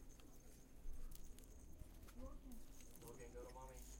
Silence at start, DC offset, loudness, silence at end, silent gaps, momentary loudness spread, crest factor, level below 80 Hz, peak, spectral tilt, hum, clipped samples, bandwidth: 0 s; under 0.1%; -61 LUFS; 0 s; none; 7 LU; 14 dB; -58 dBFS; -40 dBFS; -4.5 dB/octave; none; under 0.1%; 16.5 kHz